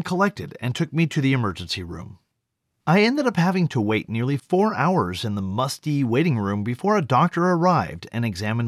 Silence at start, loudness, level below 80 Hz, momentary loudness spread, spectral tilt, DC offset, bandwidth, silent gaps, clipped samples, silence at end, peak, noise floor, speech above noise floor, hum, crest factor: 0 s; -22 LUFS; -56 dBFS; 10 LU; -6.5 dB/octave; under 0.1%; 13.5 kHz; none; under 0.1%; 0 s; -6 dBFS; -77 dBFS; 56 dB; none; 16 dB